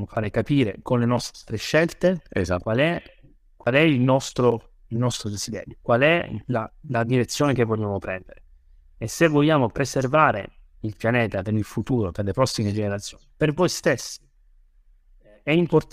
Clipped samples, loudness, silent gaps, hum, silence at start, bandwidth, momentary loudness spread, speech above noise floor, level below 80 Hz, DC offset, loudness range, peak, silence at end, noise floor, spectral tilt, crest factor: under 0.1%; -23 LUFS; none; none; 0 s; 15.5 kHz; 13 LU; 34 dB; -48 dBFS; under 0.1%; 3 LU; -4 dBFS; 0.1 s; -56 dBFS; -5.5 dB/octave; 20 dB